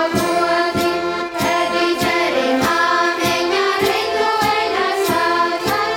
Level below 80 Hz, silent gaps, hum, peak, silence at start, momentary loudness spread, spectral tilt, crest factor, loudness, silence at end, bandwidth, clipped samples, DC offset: -48 dBFS; none; none; -4 dBFS; 0 s; 3 LU; -3.5 dB/octave; 14 dB; -17 LUFS; 0 s; 18 kHz; under 0.1%; under 0.1%